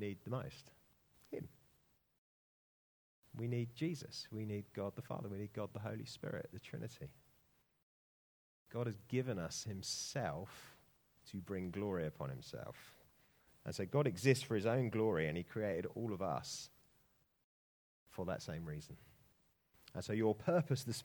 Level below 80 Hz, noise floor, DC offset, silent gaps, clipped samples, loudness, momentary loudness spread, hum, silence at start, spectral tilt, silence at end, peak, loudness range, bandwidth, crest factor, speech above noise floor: -72 dBFS; -76 dBFS; under 0.1%; 2.18-3.23 s, 7.82-8.66 s, 17.44-18.06 s; under 0.1%; -42 LUFS; 17 LU; none; 0 s; -5.5 dB/octave; 0 s; -16 dBFS; 11 LU; over 20 kHz; 26 dB; 35 dB